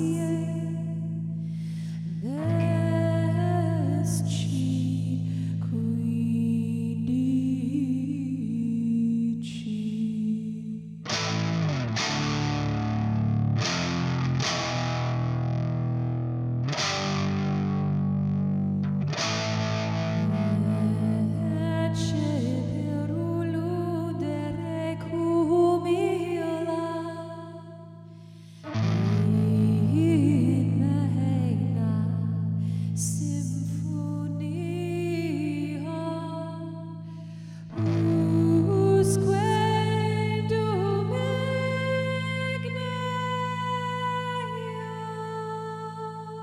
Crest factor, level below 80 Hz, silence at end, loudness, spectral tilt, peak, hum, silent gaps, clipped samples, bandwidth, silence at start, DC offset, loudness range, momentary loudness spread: 16 dB; -56 dBFS; 0 s; -27 LUFS; -6.5 dB/octave; -10 dBFS; none; none; under 0.1%; 12.5 kHz; 0 s; under 0.1%; 6 LU; 10 LU